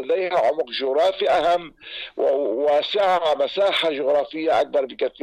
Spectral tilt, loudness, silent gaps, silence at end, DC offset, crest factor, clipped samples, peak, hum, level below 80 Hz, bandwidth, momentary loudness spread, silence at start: -3.5 dB/octave; -21 LUFS; none; 0.15 s; under 0.1%; 8 dB; under 0.1%; -12 dBFS; none; -60 dBFS; 11 kHz; 5 LU; 0 s